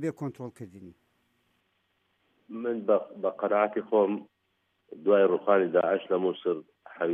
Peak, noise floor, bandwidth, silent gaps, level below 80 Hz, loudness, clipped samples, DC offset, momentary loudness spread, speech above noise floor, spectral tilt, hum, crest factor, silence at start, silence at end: -8 dBFS; -75 dBFS; 8.8 kHz; none; -82 dBFS; -27 LUFS; under 0.1%; under 0.1%; 16 LU; 48 dB; -8 dB/octave; none; 20 dB; 0 s; 0 s